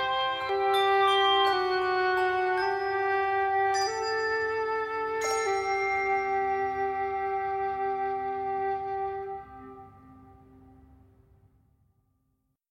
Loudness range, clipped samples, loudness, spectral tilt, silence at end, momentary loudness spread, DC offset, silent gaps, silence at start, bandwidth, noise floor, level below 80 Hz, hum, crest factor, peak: 11 LU; under 0.1%; -27 LUFS; -2.5 dB/octave; 2.5 s; 9 LU; under 0.1%; none; 0 s; 13.5 kHz; -75 dBFS; -60 dBFS; none; 16 dB; -12 dBFS